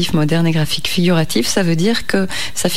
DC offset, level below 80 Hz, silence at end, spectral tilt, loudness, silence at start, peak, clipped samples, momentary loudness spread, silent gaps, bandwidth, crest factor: 8%; -42 dBFS; 0 s; -4.5 dB/octave; -16 LUFS; 0 s; -2 dBFS; under 0.1%; 3 LU; none; 16 kHz; 14 dB